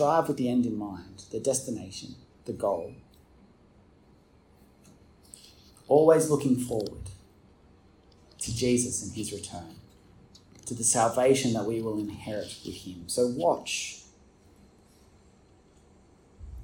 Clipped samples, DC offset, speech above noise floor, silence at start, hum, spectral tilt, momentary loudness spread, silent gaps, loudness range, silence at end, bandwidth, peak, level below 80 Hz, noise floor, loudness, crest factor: under 0.1%; under 0.1%; 32 dB; 0 s; none; -4.5 dB/octave; 21 LU; none; 10 LU; 0 s; 17.5 kHz; -6 dBFS; -58 dBFS; -59 dBFS; -28 LUFS; 24 dB